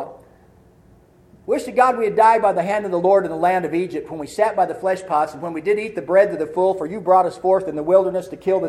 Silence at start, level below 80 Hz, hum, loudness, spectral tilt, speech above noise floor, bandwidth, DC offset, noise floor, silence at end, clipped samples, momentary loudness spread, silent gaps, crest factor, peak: 0 s; -58 dBFS; none; -19 LUFS; -6 dB/octave; 33 dB; 13 kHz; under 0.1%; -51 dBFS; 0 s; under 0.1%; 9 LU; none; 18 dB; -2 dBFS